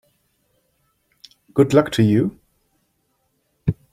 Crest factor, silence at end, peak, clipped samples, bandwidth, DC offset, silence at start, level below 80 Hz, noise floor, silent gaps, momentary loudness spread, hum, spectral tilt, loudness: 20 dB; 0.2 s; -2 dBFS; under 0.1%; 15.5 kHz; under 0.1%; 1.55 s; -50 dBFS; -68 dBFS; none; 10 LU; none; -7.5 dB/octave; -19 LUFS